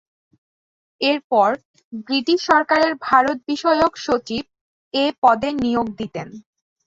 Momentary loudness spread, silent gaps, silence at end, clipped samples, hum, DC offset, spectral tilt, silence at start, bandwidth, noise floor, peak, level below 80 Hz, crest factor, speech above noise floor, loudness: 13 LU; 1.24-1.30 s, 1.65-1.74 s, 1.84-1.91 s, 4.61-4.91 s, 5.18-5.22 s; 0.45 s; under 0.1%; none; under 0.1%; -4.5 dB/octave; 1 s; 7.8 kHz; under -90 dBFS; -2 dBFS; -56 dBFS; 18 dB; over 71 dB; -19 LUFS